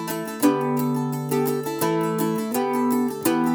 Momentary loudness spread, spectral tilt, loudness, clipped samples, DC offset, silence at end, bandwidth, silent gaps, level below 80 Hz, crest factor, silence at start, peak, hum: 3 LU; -5.5 dB/octave; -23 LUFS; under 0.1%; under 0.1%; 0 s; over 20 kHz; none; -70 dBFS; 18 dB; 0 s; -4 dBFS; none